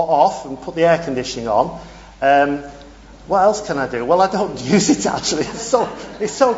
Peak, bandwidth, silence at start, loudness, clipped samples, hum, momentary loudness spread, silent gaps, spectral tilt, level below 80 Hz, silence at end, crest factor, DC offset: 0 dBFS; 8 kHz; 0 s; -18 LUFS; under 0.1%; none; 10 LU; none; -4 dB/octave; -46 dBFS; 0 s; 16 dB; under 0.1%